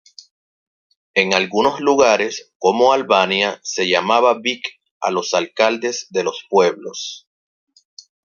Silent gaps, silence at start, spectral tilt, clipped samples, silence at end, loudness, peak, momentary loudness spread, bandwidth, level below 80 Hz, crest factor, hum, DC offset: 2.55-2.60 s, 4.91-5.01 s; 1.15 s; -3 dB/octave; under 0.1%; 1.1 s; -17 LUFS; 0 dBFS; 12 LU; 7.4 kHz; -64 dBFS; 18 dB; none; under 0.1%